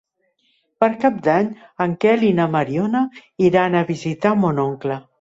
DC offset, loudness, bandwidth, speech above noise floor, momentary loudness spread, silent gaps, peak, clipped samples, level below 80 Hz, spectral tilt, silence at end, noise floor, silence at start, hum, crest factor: under 0.1%; -19 LUFS; 7.8 kHz; 47 dB; 8 LU; none; -4 dBFS; under 0.1%; -58 dBFS; -7.5 dB/octave; 0.2 s; -66 dBFS; 0.8 s; none; 16 dB